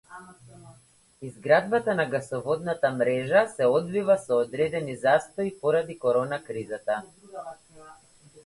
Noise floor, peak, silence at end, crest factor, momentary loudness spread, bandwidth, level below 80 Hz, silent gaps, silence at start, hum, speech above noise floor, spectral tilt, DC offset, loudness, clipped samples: -58 dBFS; -6 dBFS; 0.05 s; 20 dB; 19 LU; 11.5 kHz; -66 dBFS; none; 0.1 s; none; 32 dB; -6 dB/octave; under 0.1%; -25 LUFS; under 0.1%